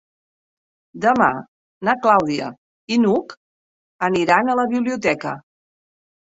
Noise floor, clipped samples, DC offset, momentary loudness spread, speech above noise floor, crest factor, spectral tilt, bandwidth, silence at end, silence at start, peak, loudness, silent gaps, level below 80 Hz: under -90 dBFS; under 0.1%; under 0.1%; 13 LU; over 72 dB; 20 dB; -5.5 dB/octave; 8 kHz; 0.85 s; 0.95 s; -2 dBFS; -19 LUFS; 1.48-1.81 s, 2.58-2.87 s, 3.37-3.99 s; -60 dBFS